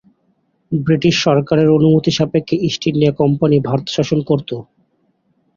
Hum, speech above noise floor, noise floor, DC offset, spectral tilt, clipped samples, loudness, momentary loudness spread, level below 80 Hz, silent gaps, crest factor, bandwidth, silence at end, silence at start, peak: none; 48 dB; -62 dBFS; under 0.1%; -6.5 dB/octave; under 0.1%; -15 LUFS; 7 LU; -50 dBFS; none; 16 dB; 7.4 kHz; 0.95 s; 0.7 s; 0 dBFS